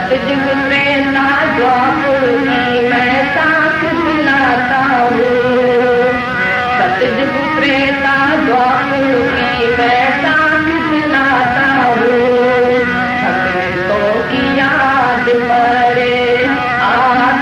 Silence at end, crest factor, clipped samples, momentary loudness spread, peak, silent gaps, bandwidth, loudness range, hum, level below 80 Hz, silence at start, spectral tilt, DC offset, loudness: 0 s; 12 dB; under 0.1%; 3 LU; 0 dBFS; none; 12.5 kHz; 1 LU; none; -40 dBFS; 0 s; -6 dB/octave; under 0.1%; -12 LUFS